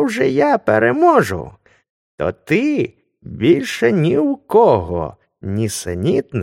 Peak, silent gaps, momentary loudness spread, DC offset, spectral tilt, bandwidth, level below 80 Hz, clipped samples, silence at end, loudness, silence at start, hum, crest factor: 0 dBFS; 1.90-2.18 s; 13 LU; under 0.1%; -6 dB/octave; 16 kHz; -46 dBFS; under 0.1%; 0 s; -16 LUFS; 0 s; none; 16 dB